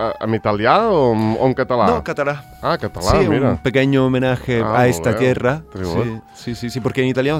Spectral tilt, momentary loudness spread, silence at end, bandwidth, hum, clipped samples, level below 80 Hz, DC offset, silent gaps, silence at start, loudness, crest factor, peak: -6.5 dB/octave; 9 LU; 0 s; 16 kHz; none; under 0.1%; -38 dBFS; under 0.1%; none; 0 s; -17 LUFS; 16 dB; 0 dBFS